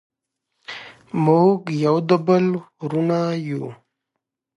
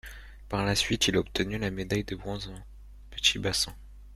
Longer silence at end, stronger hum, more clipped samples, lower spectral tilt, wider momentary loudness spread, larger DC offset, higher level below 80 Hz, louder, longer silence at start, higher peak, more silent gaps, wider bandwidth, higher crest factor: first, 0.85 s vs 0 s; neither; neither; first, -8 dB/octave vs -3.5 dB/octave; about the same, 19 LU vs 18 LU; neither; second, -68 dBFS vs -46 dBFS; first, -20 LUFS vs -28 LUFS; first, 0.7 s vs 0.05 s; first, -2 dBFS vs -8 dBFS; neither; second, 10.5 kHz vs 15.5 kHz; second, 18 dB vs 24 dB